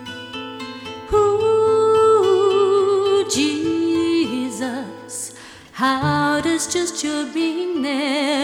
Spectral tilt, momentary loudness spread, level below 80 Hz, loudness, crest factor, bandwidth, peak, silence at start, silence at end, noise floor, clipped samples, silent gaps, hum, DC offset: -4 dB/octave; 16 LU; -48 dBFS; -18 LUFS; 14 dB; 15 kHz; -6 dBFS; 0 s; 0 s; -40 dBFS; under 0.1%; none; none; under 0.1%